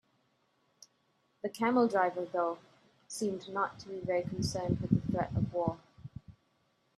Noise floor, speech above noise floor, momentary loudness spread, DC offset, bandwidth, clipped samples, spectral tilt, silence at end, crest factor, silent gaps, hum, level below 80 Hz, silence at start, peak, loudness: -74 dBFS; 42 dB; 18 LU; under 0.1%; 13 kHz; under 0.1%; -6.5 dB/octave; 0.65 s; 22 dB; none; none; -60 dBFS; 1.45 s; -12 dBFS; -33 LUFS